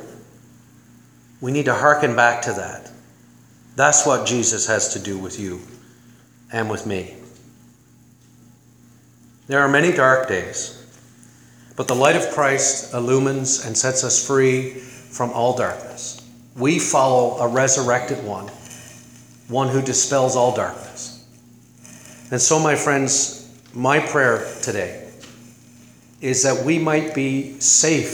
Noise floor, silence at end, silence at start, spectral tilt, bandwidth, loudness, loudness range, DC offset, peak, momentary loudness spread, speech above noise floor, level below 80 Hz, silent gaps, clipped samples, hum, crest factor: -51 dBFS; 0 s; 0 s; -3 dB/octave; over 20 kHz; -18 LUFS; 5 LU; under 0.1%; 0 dBFS; 17 LU; 32 dB; -62 dBFS; none; under 0.1%; none; 20 dB